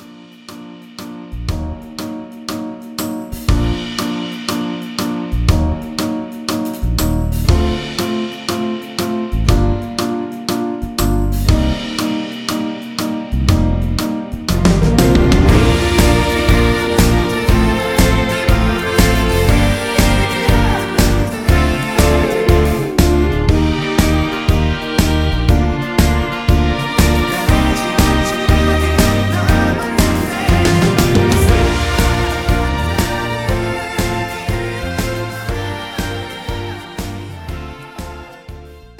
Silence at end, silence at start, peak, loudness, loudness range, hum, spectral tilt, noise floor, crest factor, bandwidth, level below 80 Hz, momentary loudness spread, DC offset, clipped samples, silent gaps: 0.1 s; 0 s; 0 dBFS; -15 LUFS; 8 LU; none; -5.5 dB/octave; -37 dBFS; 14 dB; 19 kHz; -20 dBFS; 13 LU; under 0.1%; under 0.1%; none